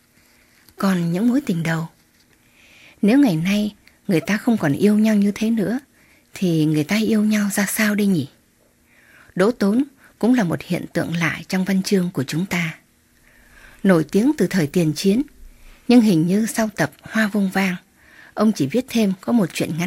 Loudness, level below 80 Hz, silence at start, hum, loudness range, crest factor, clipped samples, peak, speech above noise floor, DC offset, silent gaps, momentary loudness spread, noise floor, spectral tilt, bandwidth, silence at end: -19 LUFS; -54 dBFS; 0.8 s; none; 3 LU; 18 dB; under 0.1%; -2 dBFS; 40 dB; under 0.1%; none; 8 LU; -58 dBFS; -6 dB/octave; 16 kHz; 0 s